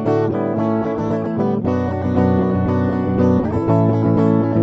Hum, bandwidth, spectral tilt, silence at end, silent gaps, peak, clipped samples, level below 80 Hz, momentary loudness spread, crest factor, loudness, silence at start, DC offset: none; 6.4 kHz; -10.5 dB/octave; 0 s; none; -2 dBFS; under 0.1%; -42 dBFS; 4 LU; 14 dB; -18 LUFS; 0 s; under 0.1%